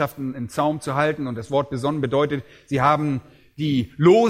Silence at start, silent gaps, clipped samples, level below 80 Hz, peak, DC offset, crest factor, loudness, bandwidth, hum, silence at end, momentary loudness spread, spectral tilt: 0 s; none; under 0.1%; -54 dBFS; -4 dBFS; under 0.1%; 18 dB; -23 LUFS; 16 kHz; none; 0 s; 9 LU; -7 dB/octave